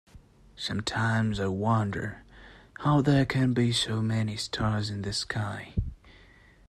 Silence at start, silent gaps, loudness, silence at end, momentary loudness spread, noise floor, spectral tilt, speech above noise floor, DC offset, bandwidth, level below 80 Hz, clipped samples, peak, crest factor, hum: 0.15 s; none; -28 LUFS; 0.55 s; 11 LU; -56 dBFS; -5.5 dB/octave; 29 dB; under 0.1%; 12.5 kHz; -48 dBFS; under 0.1%; -12 dBFS; 18 dB; none